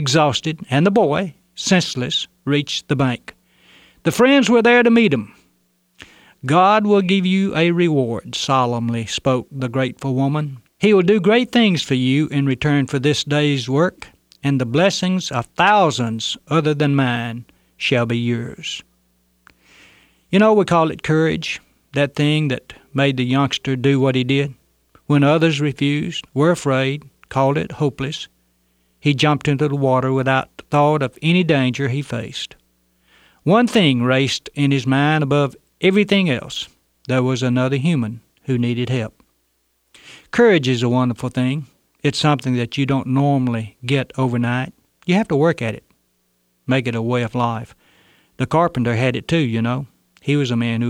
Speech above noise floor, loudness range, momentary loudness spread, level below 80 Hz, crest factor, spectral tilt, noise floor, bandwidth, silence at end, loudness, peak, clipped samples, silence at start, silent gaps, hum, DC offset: 49 dB; 4 LU; 12 LU; -54 dBFS; 16 dB; -6 dB/octave; -66 dBFS; 14.5 kHz; 0 s; -18 LUFS; -2 dBFS; under 0.1%; 0 s; none; none; under 0.1%